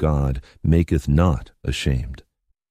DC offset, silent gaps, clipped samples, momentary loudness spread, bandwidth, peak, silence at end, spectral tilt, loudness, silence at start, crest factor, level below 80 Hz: under 0.1%; none; under 0.1%; 9 LU; 14 kHz; -4 dBFS; 0.55 s; -7 dB/octave; -22 LUFS; 0 s; 16 dB; -28 dBFS